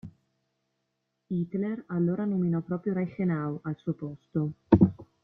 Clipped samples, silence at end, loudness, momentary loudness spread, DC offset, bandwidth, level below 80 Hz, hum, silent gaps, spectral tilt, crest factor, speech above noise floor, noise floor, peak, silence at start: under 0.1%; 0.2 s; -29 LUFS; 12 LU; under 0.1%; 4.2 kHz; -56 dBFS; none; none; -12 dB/octave; 24 dB; 50 dB; -80 dBFS; -4 dBFS; 0.05 s